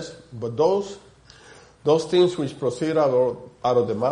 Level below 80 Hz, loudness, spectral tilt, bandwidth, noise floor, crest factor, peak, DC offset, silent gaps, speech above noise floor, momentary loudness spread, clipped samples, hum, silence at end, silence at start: -60 dBFS; -22 LUFS; -6.5 dB/octave; 10.5 kHz; -49 dBFS; 16 dB; -8 dBFS; under 0.1%; none; 27 dB; 13 LU; under 0.1%; none; 0 s; 0 s